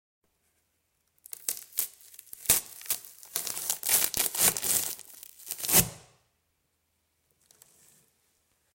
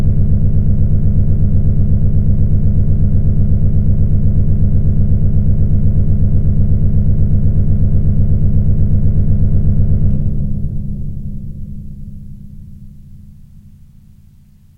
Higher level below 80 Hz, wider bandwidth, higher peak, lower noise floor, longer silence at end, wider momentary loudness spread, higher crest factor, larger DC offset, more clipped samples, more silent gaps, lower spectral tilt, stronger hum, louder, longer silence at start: second, -58 dBFS vs -16 dBFS; first, 17 kHz vs 1.5 kHz; second, -6 dBFS vs -2 dBFS; first, -76 dBFS vs -43 dBFS; first, 2.75 s vs 1.45 s; first, 17 LU vs 13 LU; first, 28 dB vs 10 dB; neither; neither; neither; second, -0.5 dB/octave vs -13 dB/octave; neither; second, -27 LUFS vs -15 LUFS; first, 1.4 s vs 0 s